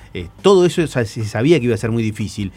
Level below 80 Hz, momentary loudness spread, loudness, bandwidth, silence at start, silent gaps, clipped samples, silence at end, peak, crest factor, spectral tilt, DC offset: -44 dBFS; 10 LU; -17 LUFS; 13.5 kHz; 0 s; none; under 0.1%; 0.05 s; 0 dBFS; 16 dB; -6.5 dB/octave; under 0.1%